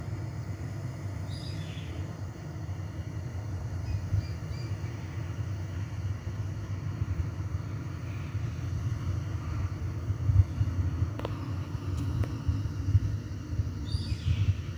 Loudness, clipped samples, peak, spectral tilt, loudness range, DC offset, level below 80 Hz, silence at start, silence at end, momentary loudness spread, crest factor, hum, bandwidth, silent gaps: -34 LUFS; under 0.1%; -10 dBFS; -7 dB/octave; 5 LU; under 0.1%; -42 dBFS; 0 s; 0 s; 9 LU; 22 dB; none; 10 kHz; none